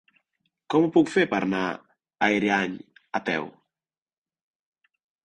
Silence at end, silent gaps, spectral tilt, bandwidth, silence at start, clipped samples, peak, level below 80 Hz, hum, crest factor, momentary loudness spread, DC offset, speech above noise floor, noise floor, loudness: 1.75 s; none; -5.5 dB/octave; 10 kHz; 0.7 s; under 0.1%; -6 dBFS; -64 dBFS; none; 20 dB; 13 LU; under 0.1%; over 67 dB; under -90 dBFS; -24 LUFS